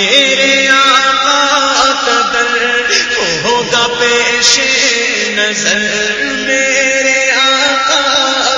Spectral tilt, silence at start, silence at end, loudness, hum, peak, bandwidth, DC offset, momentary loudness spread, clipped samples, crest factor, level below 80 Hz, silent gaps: -0.5 dB/octave; 0 s; 0 s; -9 LUFS; none; 0 dBFS; 11 kHz; under 0.1%; 5 LU; 0.1%; 10 dB; -46 dBFS; none